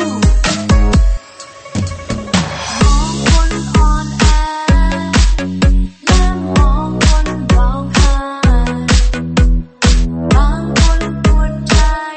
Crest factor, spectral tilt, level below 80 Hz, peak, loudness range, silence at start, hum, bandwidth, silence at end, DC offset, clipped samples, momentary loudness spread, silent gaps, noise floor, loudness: 12 dB; -5 dB/octave; -14 dBFS; 0 dBFS; 2 LU; 0 s; none; 8.8 kHz; 0 s; 0.4%; under 0.1%; 4 LU; none; -34 dBFS; -14 LUFS